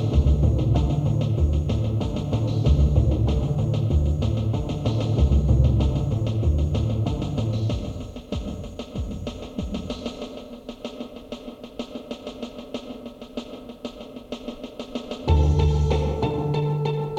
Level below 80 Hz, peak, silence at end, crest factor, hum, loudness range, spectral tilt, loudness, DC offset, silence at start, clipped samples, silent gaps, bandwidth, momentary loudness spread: -28 dBFS; -6 dBFS; 0 s; 16 dB; none; 14 LU; -8 dB/octave; -24 LUFS; under 0.1%; 0 s; under 0.1%; none; 7.8 kHz; 16 LU